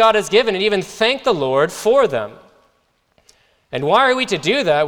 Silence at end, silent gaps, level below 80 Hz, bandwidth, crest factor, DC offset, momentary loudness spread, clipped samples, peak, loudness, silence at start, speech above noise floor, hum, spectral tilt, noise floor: 0 s; none; -54 dBFS; 18 kHz; 16 dB; under 0.1%; 8 LU; under 0.1%; -2 dBFS; -16 LUFS; 0 s; 47 dB; none; -4 dB/octave; -63 dBFS